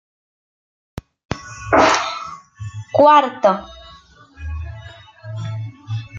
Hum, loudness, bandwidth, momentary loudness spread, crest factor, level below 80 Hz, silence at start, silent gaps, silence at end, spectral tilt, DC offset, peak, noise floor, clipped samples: none; -16 LUFS; 9 kHz; 26 LU; 18 dB; -42 dBFS; 0.95 s; 1.25-1.29 s; 0 s; -5 dB/octave; under 0.1%; -2 dBFS; -46 dBFS; under 0.1%